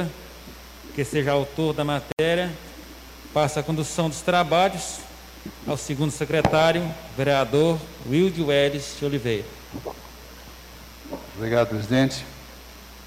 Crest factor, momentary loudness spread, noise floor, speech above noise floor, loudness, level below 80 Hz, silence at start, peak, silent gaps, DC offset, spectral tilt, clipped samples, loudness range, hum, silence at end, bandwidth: 16 dB; 21 LU; -43 dBFS; 20 dB; -23 LUFS; -46 dBFS; 0 s; -10 dBFS; 2.13-2.17 s; under 0.1%; -5 dB/octave; under 0.1%; 6 LU; none; 0 s; 16 kHz